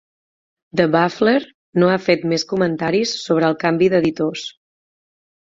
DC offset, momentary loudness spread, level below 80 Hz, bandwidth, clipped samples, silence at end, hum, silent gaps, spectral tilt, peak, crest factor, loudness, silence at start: under 0.1%; 8 LU; -58 dBFS; 7.8 kHz; under 0.1%; 0.95 s; none; 1.54-1.73 s; -5.5 dB/octave; -2 dBFS; 18 dB; -18 LUFS; 0.75 s